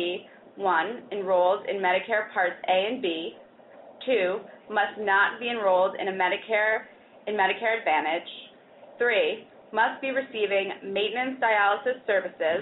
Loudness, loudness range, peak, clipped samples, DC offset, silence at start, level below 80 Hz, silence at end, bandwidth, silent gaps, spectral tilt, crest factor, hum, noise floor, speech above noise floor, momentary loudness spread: -26 LUFS; 2 LU; -10 dBFS; under 0.1%; under 0.1%; 0 s; -76 dBFS; 0 s; 4.1 kHz; none; -0.5 dB/octave; 16 dB; none; -51 dBFS; 25 dB; 9 LU